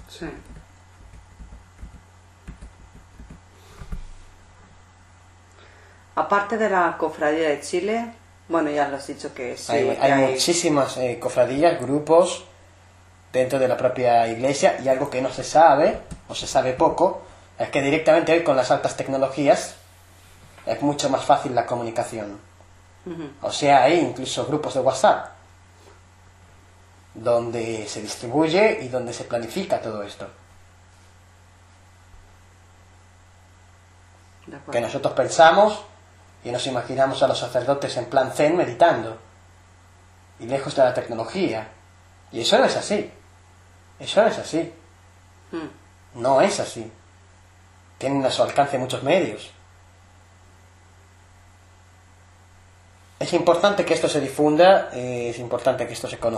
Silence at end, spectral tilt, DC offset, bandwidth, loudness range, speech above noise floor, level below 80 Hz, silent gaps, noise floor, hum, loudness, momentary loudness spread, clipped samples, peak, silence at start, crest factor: 0 s; -4.5 dB/octave; under 0.1%; 13 kHz; 7 LU; 30 dB; -52 dBFS; none; -51 dBFS; none; -21 LUFS; 17 LU; under 0.1%; -2 dBFS; 0 s; 22 dB